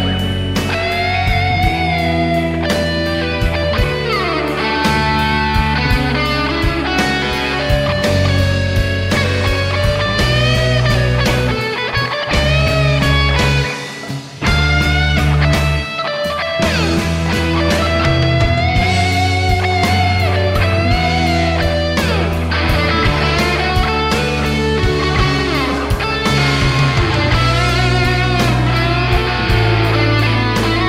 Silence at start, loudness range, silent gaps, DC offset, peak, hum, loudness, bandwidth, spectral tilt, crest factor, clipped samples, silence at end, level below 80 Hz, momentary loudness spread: 0 s; 2 LU; none; under 0.1%; -2 dBFS; none; -15 LUFS; 16 kHz; -5.5 dB/octave; 12 dB; under 0.1%; 0 s; -22 dBFS; 4 LU